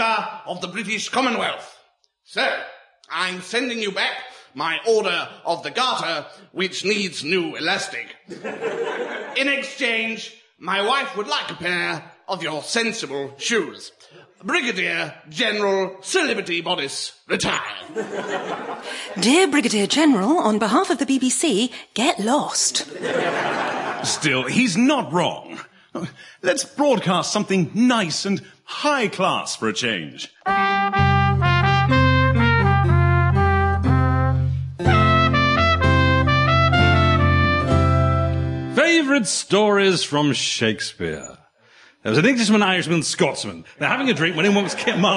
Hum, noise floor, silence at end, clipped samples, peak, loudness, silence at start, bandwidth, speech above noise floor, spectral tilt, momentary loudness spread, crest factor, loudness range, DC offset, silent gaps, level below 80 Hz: none; -60 dBFS; 0 s; under 0.1%; -4 dBFS; -20 LUFS; 0 s; 11.5 kHz; 38 dB; -4.5 dB/octave; 13 LU; 18 dB; 7 LU; under 0.1%; none; -44 dBFS